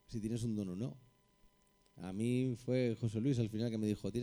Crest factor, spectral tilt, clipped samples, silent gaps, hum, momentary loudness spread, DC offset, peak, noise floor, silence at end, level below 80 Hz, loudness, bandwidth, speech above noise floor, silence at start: 16 dB; -7.5 dB/octave; under 0.1%; none; none; 9 LU; under 0.1%; -22 dBFS; -71 dBFS; 0 s; -64 dBFS; -38 LUFS; over 20 kHz; 34 dB; 0.1 s